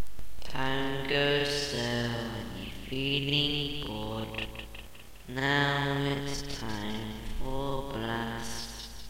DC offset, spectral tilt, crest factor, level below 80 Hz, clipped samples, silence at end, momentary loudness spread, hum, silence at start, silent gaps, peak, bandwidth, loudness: under 0.1%; -4.5 dB/octave; 18 dB; -44 dBFS; under 0.1%; 0 s; 14 LU; none; 0 s; none; -14 dBFS; 16 kHz; -32 LUFS